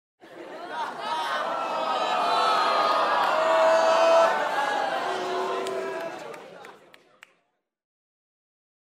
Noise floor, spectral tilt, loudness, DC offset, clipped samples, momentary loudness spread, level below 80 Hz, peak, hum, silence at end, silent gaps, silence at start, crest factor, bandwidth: -74 dBFS; -2 dB/octave; -24 LUFS; under 0.1%; under 0.1%; 18 LU; -82 dBFS; -8 dBFS; none; 2.15 s; none; 0.25 s; 18 dB; 15 kHz